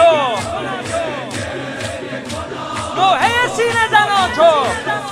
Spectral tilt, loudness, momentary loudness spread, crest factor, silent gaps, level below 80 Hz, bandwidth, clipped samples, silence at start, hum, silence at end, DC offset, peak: -3.5 dB/octave; -16 LUFS; 12 LU; 16 dB; none; -46 dBFS; 15 kHz; under 0.1%; 0 s; none; 0 s; under 0.1%; 0 dBFS